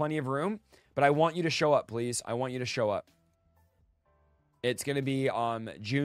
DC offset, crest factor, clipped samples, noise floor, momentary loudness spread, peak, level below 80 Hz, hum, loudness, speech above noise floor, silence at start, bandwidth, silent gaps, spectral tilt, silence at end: under 0.1%; 20 dB; under 0.1%; -69 dBFS; 9 LU; -10 dBFS; -68 dBFS; none; -30 LUFS; 39 dB; 0 s; 15.5 kHz; none; -5 dB/octave; 0 s